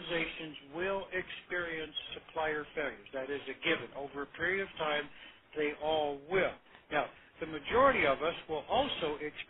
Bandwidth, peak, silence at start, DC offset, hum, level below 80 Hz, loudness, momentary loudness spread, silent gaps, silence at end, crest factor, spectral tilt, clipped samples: 4.1 kHz; -14 dBFS; 0 s; under 0.1%; none; -62 dBFS; -35 LUFS; 13 LU; none; 0.05 s; 22 dB; -7.5 dB/octave; under 0.1%